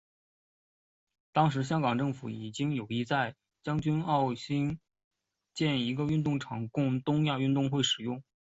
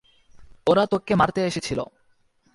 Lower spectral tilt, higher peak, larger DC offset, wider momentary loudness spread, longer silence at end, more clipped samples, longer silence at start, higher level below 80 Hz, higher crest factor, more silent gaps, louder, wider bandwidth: about the same, -6 dB/octave vs -5.5 dB/octave; second, -12 dBFS vs -6 dBFS; neither; about the same, 9 LU vs 10 LU; second, 0.35 s vs 0.7 s; neither; first, 1.35 s vs 0.35 s; second, -64 dBFS vs -52 dBFS; about the same, 20 dB vs 20 dB; first, 5.04-5.11 s vs none; second, -31 LUFS vs -23 LUFS; second, 8 kHz vs 11.5 kHz